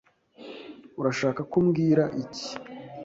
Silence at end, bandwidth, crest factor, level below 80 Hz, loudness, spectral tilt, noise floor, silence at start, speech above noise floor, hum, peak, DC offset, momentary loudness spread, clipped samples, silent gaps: 0 s; 8 kHz; 18 dB; -64 dBFS; -26 LUFS; -6.5 dB/octave; -47 dBFS; 0.4 s; 22 dB; none; -10 dBFS; under 0.1%; 20 LU; under 0.1%; none